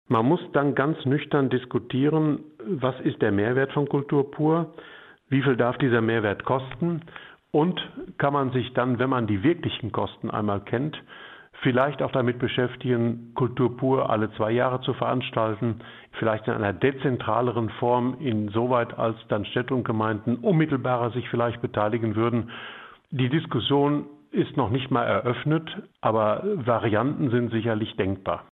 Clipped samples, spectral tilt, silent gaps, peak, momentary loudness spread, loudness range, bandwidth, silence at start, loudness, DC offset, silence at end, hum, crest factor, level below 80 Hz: under 0.1%; -10 dB/octave; none; -6 dBFS; 7 LU; 2 LU; 4.1 kHz; 0.1 s; -25 LUFS; under 0.1%; 0.1 s; none; 18 dB; -60 dBFS